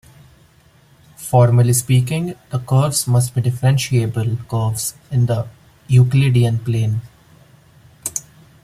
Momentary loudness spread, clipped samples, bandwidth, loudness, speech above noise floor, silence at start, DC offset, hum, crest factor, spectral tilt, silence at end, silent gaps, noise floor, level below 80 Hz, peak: 12 LU; under 0.1%; 15.5 kHz; -17 LUFS; 35 dB; 1.2 s; under 0.1%; none; 16 dB; -6 dB/octave; 0.45 s; none; -51 dBFS; -48 dBFS; -2 dBFS